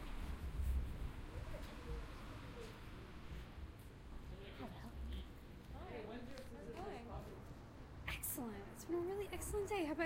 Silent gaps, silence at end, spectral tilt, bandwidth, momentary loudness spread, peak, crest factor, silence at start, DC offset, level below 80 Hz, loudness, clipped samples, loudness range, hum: none; 0 s; -5 dB/octave; 16 kHz; 12 LU; -28 dBFS; 18 dB; 0 s; under 0.1%; -50 dBFS; -49 LUFS; under 0.1%; 7 LU; none